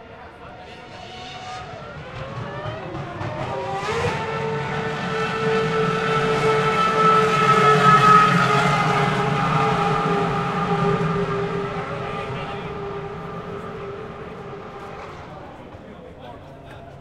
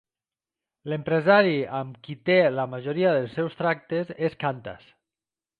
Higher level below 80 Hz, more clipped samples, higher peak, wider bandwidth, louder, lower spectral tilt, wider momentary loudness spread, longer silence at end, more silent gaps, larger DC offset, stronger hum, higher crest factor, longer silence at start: first, -46 dBFS vs -66 dBFS; neither; first, -2 dBFS vs -6 dBFS; first, 13 kHz vs 4.9 kHz; first, -20 LUFS vs -24 LUFS; second, -5.5 dB/octave vs -8.5 dB/octave; first, 24 LU vs 14 LU; second, 0 s vs 0.85 s; neither; neither; neither; about the same, 20 dB vs 20 dB; second, 0 s vs 0.85 s